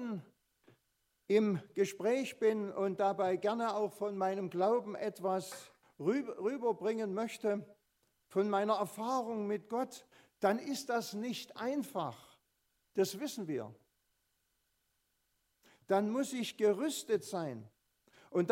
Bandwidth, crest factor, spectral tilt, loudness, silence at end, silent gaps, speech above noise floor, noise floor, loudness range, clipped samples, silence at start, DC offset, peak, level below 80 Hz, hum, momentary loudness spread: 16 kHz; 20 dB; -5 dB/octave; -36 LUFS; 0 s; none; 46 dB; -80 dBFS; 6 LU; under 0.1%; 0 s; under 0.1%; -16 dBFS; -88 dBFS; none; 9 LU